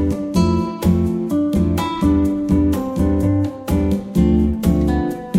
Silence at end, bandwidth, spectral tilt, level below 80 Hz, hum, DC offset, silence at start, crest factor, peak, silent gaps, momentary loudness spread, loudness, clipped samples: 0 s; 16.5 kHz; -8 dB/octave; -28 dBFS; none; under 0.1%; 0 s; 14 dB; -2 dBFS; none; 3 LU; -18 LUFS; under 0.1%